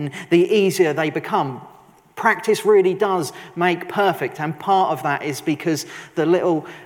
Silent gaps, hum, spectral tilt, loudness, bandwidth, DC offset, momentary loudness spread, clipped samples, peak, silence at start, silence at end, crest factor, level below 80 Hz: none; none; -5.5 dB/octave; -20 LUFS; 18 kHz; under 0.1%; 9 LU; under 0.1%; -4 dBFS; 0 s; 0 s; 16 dB; -70 dBFS